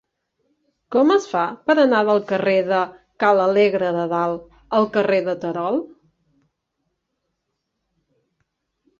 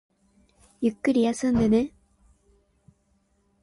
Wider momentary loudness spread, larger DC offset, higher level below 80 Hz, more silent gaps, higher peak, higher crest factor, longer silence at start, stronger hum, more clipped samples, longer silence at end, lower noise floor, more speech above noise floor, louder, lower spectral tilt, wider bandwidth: about the same, 9 LU vs 7 LU; neither; second, -64 dBFS vs -52 dBFS; neither; first, -4 dBFS vs -12 dBFS; about the same, 18 dB vs 16 dB; about the same, 0.9 s vs 0.8 s; neither; neither; first, 3.15 s vs 1.75 s; first, -77 dBFS vs -68 dBFS; first, 58 dB vs 46 dB; first, -19 LUFS vs -24 LUFS; about the same, -6 dB/octave vs -6 dB/octave; second, 7.4 kHz vs 11.5 kHz